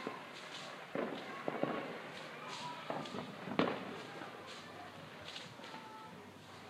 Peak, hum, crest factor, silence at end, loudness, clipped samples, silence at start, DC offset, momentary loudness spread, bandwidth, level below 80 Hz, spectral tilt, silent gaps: -12 dBFS; none; 32 dB; 0 s; -44 LUFS; under 0.1%; 0 s; under 0.1%; 12 LU; 15.5 kHz; -84 dBFS; -4.5 dB/octave; none